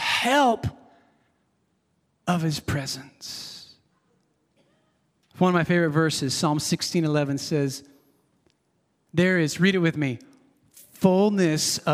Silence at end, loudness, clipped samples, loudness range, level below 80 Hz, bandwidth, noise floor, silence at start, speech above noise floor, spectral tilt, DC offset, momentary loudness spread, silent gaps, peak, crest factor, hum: 0 s; -23 LUFS; under 0.1%; 8 LU; -60 dBFS; 16 kHz; -70 dBFS; 0 s; 48 dB; -5 dB/octave; under 0.1%; 14 LU; none; -4 dBFS; 22 dB; none